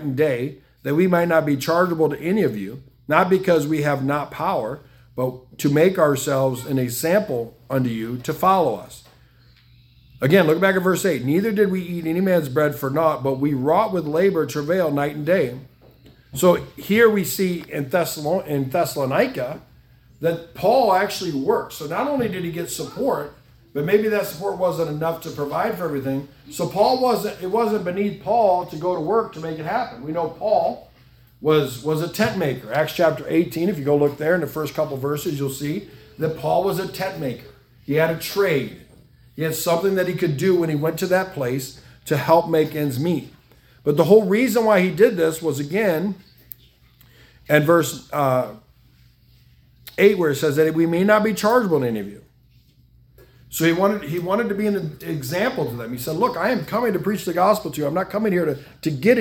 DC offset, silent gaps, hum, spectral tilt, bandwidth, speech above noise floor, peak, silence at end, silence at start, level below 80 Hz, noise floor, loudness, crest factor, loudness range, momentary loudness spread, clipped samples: under 0.1%; none; none; -6 dB/octave; 18 kHz; 35 dB; 0 dBFS; 0 s; 0 s; -56 dBFS; -55 dBFS; -21 LUFS; 20 dB; 4 LU; 11 LU; under 0.1%